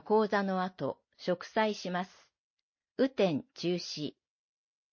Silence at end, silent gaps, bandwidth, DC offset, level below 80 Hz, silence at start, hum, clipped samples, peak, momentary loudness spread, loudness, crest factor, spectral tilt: 0.85 s; 2.38-2.73 s, 2.91-2.95 s; 7 kHz; under 0.1%; -78 dBFS; 0.05 s; none; under 0.1%; -16 dBFS; 11 LU; -33 LUFS; 18 dB; -5.5 dB/octave